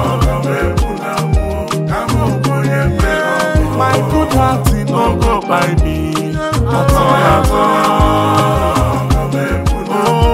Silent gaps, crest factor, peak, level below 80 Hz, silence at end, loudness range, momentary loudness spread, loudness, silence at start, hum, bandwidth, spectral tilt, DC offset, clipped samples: none; 12 dB; 0 dBFS; -20 dBFS; 0 s; 3 LU; 6 LU; -13 LUFS; 0 s; none; 16 kHz; -6 dB/octave; 0.4%; under 0.1%